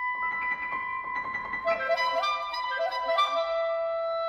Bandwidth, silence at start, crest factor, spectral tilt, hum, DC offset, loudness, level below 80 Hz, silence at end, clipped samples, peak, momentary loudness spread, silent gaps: 12.5 kHz; 0 s; 16 dB; -2 dB/octave; none; under 0.1%; -28 LUFS; -64 dBFS; 0 s; under 0.1%; -14 dBFS; 6 LU; none